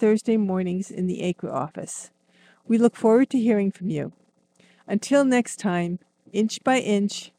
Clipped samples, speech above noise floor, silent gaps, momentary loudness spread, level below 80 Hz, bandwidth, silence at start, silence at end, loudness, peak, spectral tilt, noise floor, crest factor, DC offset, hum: under 0.1%; 37 dB; none; 12 LU; -72 dBFS; 13 kHz; 0 s; 0.15 s; -23 LUFS; -6 dBFS; -5.5 dB/octave; -60 dBFS; 18 dB; under 0.1%; none